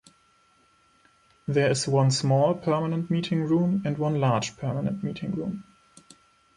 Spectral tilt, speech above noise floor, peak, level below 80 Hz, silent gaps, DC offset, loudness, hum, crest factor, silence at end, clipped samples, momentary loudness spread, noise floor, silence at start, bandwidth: -6 dB/octave; 38 dB; -10 dBFS; -62 dBFS; none; under 0.1%; -25 LUFS; none; 16 dB; 0.95 s; under 0.1%; 9 LU; -63 dBFS; 1.5 s; 11.5 kHz